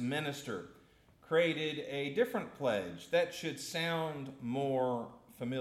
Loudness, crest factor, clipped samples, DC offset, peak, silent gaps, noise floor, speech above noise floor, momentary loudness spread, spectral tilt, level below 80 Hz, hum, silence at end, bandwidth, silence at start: -36 LUFS; 18 dB; under 0.1%; under 0.1%; -18 dBFS; none; -63 dBFS; 28 dB; 11 LU; -5 dB/octave; -74 dBFS; none; 0 s; 15.5 kHz; 0 s